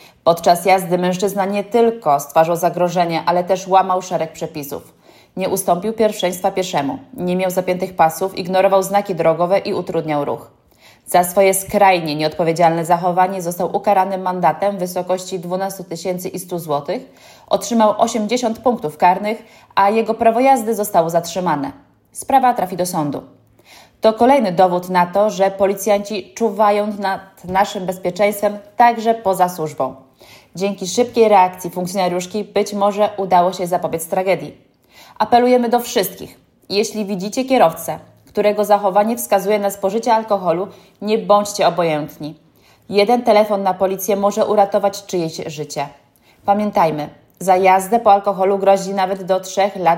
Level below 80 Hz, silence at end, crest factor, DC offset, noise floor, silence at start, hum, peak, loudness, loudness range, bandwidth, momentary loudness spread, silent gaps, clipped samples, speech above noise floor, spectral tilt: -58 dBFS; 0 s; 16 dB; under 0.1%; -49 dBFS; 0.25 s; none; 0 dBFS; -17 LUFS; 3 LU; 16.5 kHz; 11 LU; none; under 0.1%; 33 dB; -5 dB/octave